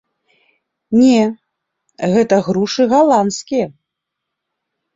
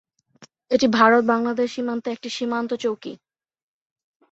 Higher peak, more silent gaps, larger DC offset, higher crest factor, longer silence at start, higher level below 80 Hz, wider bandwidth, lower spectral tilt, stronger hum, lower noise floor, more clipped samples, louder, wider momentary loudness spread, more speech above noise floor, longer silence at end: about the same, -2 dBFS vs -2 dBFS; neither; neither; second, 16 dB vs 22 dB; first, 0.9 s vs 0.4 s; first, -56 dBFS vs -66 dBFS; about the same, 7.8 kHz vs 8 kHz; about the same, -5.5 dB/octave vs -4.5 dB/octave; neither; first, -79 dBFS vs -53 dBFS; neither; first, -14 LUFS vs -21 LUFS; second, 9 LU vs 13 LU; first, 65 dB vs 32 dB; about the same, 1.25 s vs 1.15 s